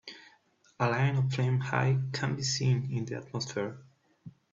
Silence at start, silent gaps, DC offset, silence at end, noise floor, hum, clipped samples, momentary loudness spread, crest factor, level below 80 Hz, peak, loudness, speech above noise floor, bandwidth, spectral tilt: 0.05 s; none; under 0.1%; 0.25 s; -65 dBFS; none; under 0.1%; 9 LU; 20 dB; -66 dBFS; -12 dBFS; -30 LUFS; 36 dB; 7.8 kHz; -5.5 dB/octave